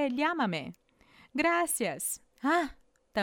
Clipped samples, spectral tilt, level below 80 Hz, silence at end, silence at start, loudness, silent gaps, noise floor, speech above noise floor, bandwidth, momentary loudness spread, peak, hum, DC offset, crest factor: under 0.1%; -3.5 dB/octave; -62 dBFS; 0 s; 0 s; -31 LUFS; none; -61 dBFS; 31 dB; 19.5 kHz; 11 LU; -14 dBFS; none; under 0.1%; 16 dB